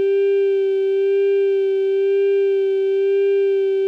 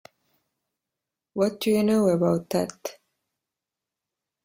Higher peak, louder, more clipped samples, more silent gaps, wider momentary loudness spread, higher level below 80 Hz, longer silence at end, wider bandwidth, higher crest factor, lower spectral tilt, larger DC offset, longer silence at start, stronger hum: about the same, -12 dBFS vs -10 dBFS; first, -18 LUFS vs -24 LUFS; neither; neither; second, 2 LU vs 16 LU; second, under -90 dBFS vs -66 dBFS; second, 0 s vs 1.55 s; second, 4.5 kHz vs 16.5 kHz; second, 4 dB vs 18 dB; second, -4.5 dB/octave vs -6.5 dB/octave; neither; second, 0 s vs 1.35 s; neither